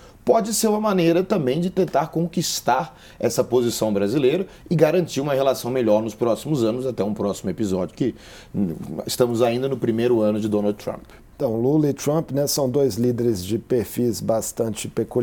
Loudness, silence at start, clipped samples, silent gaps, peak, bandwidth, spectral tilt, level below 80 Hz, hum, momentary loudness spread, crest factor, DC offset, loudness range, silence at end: -22 LUFS; 0 s; under 0.1%; none; -2 dBFS; 19.5 kHz; -5.5 dB/octave; -52 dBFS; none; 7 LU; 18 dB; under 0.1%; 3 LU; 0 s